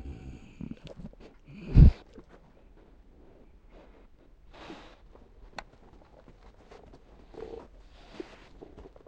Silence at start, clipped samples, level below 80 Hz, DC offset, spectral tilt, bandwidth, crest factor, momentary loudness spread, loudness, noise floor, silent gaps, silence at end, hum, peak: 0.05 s; under 0.1%; -34 dBFS; under 0.1%; -9.5 dB/octave; 6.2 kHz; 26 dB; 31 LU; -23 LUFS; -56 dBFS; none; 7.15 s; none; -4 dBFS